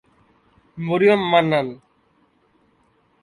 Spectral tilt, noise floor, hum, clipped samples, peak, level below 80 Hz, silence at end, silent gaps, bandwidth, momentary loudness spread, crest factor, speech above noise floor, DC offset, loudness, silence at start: -7 dB/octave; -61 dBFS; none; under 0.1%; -4 dBFS; -62 dBFS; 1.45 s; none; 10.5 kHz; 15 LU; 18 dB; 44 dB; under 0.1%; -19 LUFS; 0.75 s